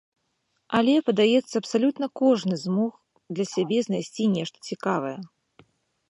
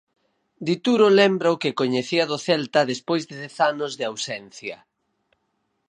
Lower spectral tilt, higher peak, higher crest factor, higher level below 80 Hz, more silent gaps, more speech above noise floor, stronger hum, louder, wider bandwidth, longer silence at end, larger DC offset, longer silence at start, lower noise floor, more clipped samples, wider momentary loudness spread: about the same, -5.5 dB/octave vs -4.5 dB/octave; about the same, -6 dBFS vs -4 dBFS; about the same, 18 dB vs 20 dB; about the same, -70 dBFS vs -74 dBFS; neither; about the same, 50 dB vs 51 dB; neither; second, -25 LUFS vs -22 LUFS; about the same, 11 kHz vs 10 kHz; second, 0.85 s vs 1.15 s; neither; about the same, 0.7 s vs 0.6 s; about the same, -74 dBFS vs -73 dBFS; neither; second, 10 LU vs 16 LU